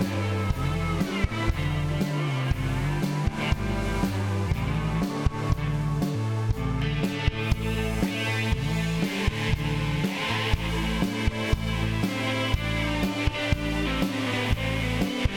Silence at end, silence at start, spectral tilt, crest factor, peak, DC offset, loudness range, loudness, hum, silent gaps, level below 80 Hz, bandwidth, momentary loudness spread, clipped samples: 0 s; 0 s; -6 dB/octave; 18 dB; -8 dBFS; under 0.1%; 1 LU; -27 LUFS; none; none; -34 dBFS; 19 kHz; 1 LU; under 0.1%